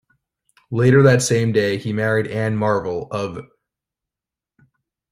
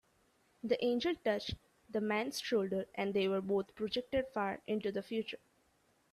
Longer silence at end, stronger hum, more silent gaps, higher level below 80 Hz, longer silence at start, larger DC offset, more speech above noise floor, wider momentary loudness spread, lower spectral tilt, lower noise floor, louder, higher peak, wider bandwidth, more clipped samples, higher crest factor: first, 1.7 s vs 0.75 s; neither; neither; first, -54 dBFS vs -64 dBFS; about the same, 0.7 s vs 0.65 s; neither; first, 71 dB vs 38 dB; first, 13 LU vs 8 LU; about the same, -6 dB/octave vs -5 dB/octave; first, -88 dBFS vs -73 dBFS; first, -18 LUFS vs -37 LUFS; first, -2 dBFS vs -20 dBFS; about the same, 15 kHz vs 14 kHz; neither; about the same, 18 dB vs 18 dB